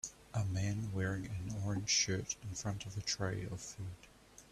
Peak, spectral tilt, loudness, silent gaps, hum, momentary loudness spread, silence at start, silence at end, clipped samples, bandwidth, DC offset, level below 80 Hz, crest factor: -20 dBFS; -3.5 dB/octave; -38 LUFS; none; none; 14 LU; 0.05 s; 0.05 s; under 0.1%; 13.5 kHz; under 0.1%; -60 dBFS; 18 dB